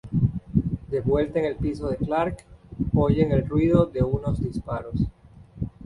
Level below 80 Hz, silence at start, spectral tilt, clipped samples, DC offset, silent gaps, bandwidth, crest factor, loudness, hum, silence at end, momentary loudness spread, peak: -38 dBFS; 0.05 s; -9.5 dB/octave; under 0.1%; under 0.1%; none; 11 kHz; 20 dB; -25 LUFS; none; 0 s; 11 LU; -4 dBFS